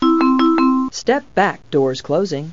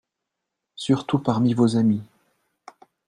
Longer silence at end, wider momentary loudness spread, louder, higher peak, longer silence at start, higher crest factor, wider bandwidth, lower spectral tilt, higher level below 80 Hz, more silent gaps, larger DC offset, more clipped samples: second, 0 s vs 1.05 s; about the same, 6 LU vs 8 LU; first, -17 LUFS vs -22 LUFS; about the same, -4 dBFS vs -6 dBFS; second, 0 s vs 0.8 s; about the same, 14 dB vs 18 dB; second, 7.6 kHz vs 10.5 kHz; second, -5.5 dB/octave vs -7.5 dB/octave; first, -52 dBFS vs -64 dBFS; neither; neither; neither